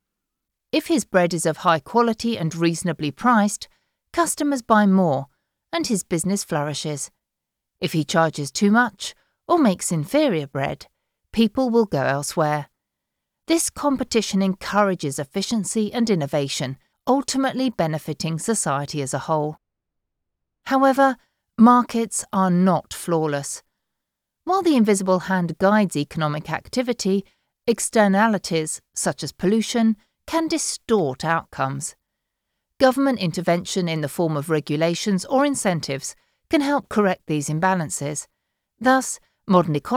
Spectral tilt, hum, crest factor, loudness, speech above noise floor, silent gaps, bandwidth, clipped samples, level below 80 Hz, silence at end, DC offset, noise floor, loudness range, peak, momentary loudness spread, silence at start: -5 dB/octave; none; 18 dB; -21 LUFS; 62 dB; none; 16.5 kHz; under 0.1%; -58 dBFS; 0 s; under 0.1%; -83 dBFS; 3 LU; -4 dBFS; 10 LU; 0.75 s